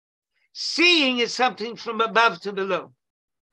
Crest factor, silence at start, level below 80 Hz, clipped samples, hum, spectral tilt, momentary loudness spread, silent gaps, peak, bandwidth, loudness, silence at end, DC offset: 20 dB; 0.55 s; -76 dBFS; under 0.1%; none; -2.5 dB/octave; 14 LU; none; -4 dBFS; 11 kHz; -21 LUFS; 0.65 s; under 0.1%